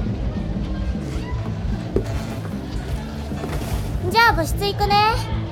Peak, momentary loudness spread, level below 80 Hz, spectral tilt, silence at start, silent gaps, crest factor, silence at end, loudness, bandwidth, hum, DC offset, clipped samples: -4 dBFS; 12 LU; -30 dBFS; -5.5 dB/octave; 0 s; none; 18 dB; 0 s; -22 LUFS; 18 kHz; none; under 0.1%; under 0.1%